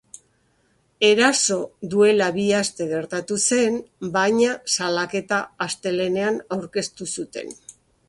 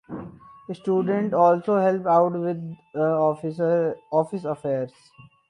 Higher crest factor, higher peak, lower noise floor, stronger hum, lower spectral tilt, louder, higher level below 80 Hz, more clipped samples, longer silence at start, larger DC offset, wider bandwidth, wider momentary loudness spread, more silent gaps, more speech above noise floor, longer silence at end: about the same, 20 dB vs 18 dB; about the same, -4 dBFS vs -6 dBFS; first, -64 dBFS vs -42 dBFS; neither; second, -3 dB/octave vs -9 dB/octave; about the same, -21 LUFS vs -23 LUFS; about the same, -64 dBFS vs -66 dBFS; neither; first, 1 s vs 0.1 s; neither; about the same, 11.5 kHz vs 10.5 kHz; second, 12 LU vs 15 LU; neither; first, 43 dB vs 19 dB; about the same, 0.35 s vs 0.25 s